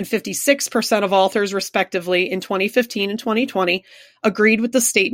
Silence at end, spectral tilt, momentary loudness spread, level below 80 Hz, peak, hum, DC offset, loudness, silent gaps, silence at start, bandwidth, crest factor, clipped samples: 0 s; -3 dB/octave; 6 LU; -64 dBFS; -2 dBFS; none; under 0.1%; -19 LUFS; none; 0 s; 16.5 kHz; 18 dB; under 0.1%